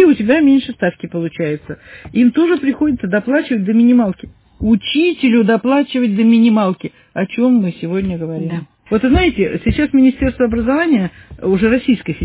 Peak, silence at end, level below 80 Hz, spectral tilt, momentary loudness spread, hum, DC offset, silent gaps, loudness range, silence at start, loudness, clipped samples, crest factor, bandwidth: 0 dBFS; 0 s; -34 dBFS; -11 dB/octave; 11 LU; none; under 0.1%; none; 2 LU; 0 s; -14 LUFS; under 0.1%; 14 dB; 4 kHz